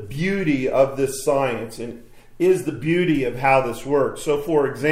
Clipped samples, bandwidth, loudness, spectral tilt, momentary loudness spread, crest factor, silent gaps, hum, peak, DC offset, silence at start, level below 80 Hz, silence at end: under 0.1%; 16 kHz; -21 LUFS; -6 dB/octave; 6 LU; 18 dB; none; none; -4 dBFS; under 0.1%; 0 s; -44 dBFS; 0 s